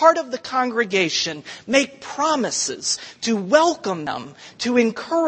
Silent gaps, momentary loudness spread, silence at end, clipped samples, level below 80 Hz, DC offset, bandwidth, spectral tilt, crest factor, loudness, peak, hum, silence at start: none; 10 LU; 0 s; under 0.1%; -66 dBFS; under 0.1%; 8.8 kHz; -2.5 dB/octave; 20 dB; -21 LUFS; -2 dBFS; none; 0 s